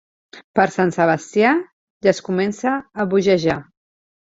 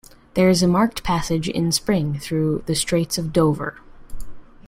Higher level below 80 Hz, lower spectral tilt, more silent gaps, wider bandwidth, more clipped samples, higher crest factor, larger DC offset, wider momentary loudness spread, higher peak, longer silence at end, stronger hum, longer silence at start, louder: second, -58 dBFS vs -40 dBFS; about the same, -6 dB/octave vs -5 dB/octave; first, 0.44-0.54 s, 1.73-2.00 s vs none; second, 8 kHz vs 16.5 kHz; neither; about the same, 18 dB vs 16 dB; neither; about the same, 6 LU vs 7 LU; about the same, -2 dBFS vs -4 dBFS; first, 0.7 s vs 0.05 s; neither; about the same, 0.35 s vs 0.35 s; about the same, -19 LUFS vs -20 LUFS